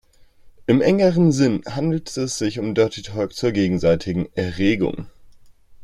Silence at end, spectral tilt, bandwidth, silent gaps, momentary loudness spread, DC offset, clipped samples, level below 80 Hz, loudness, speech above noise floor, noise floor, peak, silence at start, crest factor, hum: 0 s; -6 dB/octave; 12.5 kHz; none; 9 LU; under 0.1%; under 0.1%; -48 dBFS; -20 LUFS; 29 dB; -48 dBFS; -4 dBFS; 0.45 s; 16 dB; none